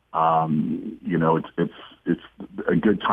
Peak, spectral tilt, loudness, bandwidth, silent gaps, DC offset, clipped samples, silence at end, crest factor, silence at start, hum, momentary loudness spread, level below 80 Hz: -6 dBFS; -9.5 dB/octave; -24 LUFS; 3.8 kHz; none; under 0.1%; under 0.1%; 0 s; 16 dB; 0.15 s; none; 10 LU; -56 dBFS